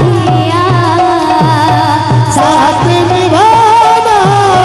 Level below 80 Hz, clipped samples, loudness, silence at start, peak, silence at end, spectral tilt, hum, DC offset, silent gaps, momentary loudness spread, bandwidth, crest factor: -36 dBFS; 0.3%; -8 LUFS; 0 s; 0 dBFS; 0 s; -5.5 dB/octave; none; under 0.1%; none; 4 LU; 12.5 kHz; 8 dB